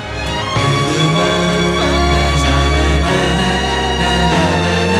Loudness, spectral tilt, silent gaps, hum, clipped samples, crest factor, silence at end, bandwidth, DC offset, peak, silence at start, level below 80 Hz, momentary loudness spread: -14 LUFS; -5 dB/octave; none; none; under 0.1%; 12 dB; 0 s; 13 kHz; under 0.1%; -2 dBFS; 0 s; -22 dBFS; 3 LU